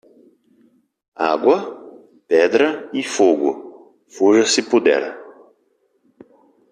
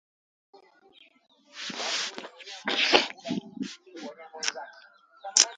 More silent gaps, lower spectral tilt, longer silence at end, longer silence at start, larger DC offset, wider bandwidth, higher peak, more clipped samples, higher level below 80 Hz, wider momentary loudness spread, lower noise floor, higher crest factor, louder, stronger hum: neither; first, -3 dB/octave vs -0.5 dB/octave; first, 1.4 s vs 0 s; first, 1.2 s vs 0.55 s; neither; about the same, 10.5 kHz vs 11 kHz; about the same, -2 dBFS vs 0 dBFS; neither; first, -68 dBFS vs -74 dBFS; second, 16 LU vs 21 LU; first, -64 dBFS vs -59 dBFS; second, 18 dB vs 32 dB; first, -17 LUFS vs -28 LUFS; neither